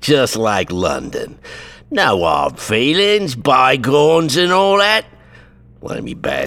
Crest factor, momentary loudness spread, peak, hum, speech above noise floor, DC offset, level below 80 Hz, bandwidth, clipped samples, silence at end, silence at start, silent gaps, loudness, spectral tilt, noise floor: 16 dB; 16 LU; 0 dBFS; none; 28 dB; under 0.1%; -44 dBFS; 17 kHz; under 0.1%; 0 s; 0 s; none; -14 LUFS; -4 dB/octave; -43 dBFS